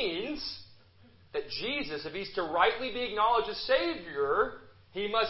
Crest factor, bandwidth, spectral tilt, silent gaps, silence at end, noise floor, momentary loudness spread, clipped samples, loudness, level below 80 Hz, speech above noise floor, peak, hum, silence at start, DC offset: 22 dB; 5.8 kHz; -7 dB/octave; none; 0 s; -59 dBFS; 12 LU; under 0.1%; -31 LUFS; -60 dBFS; 29 dB; -8 dBFS; none; 0 s; under 0.1%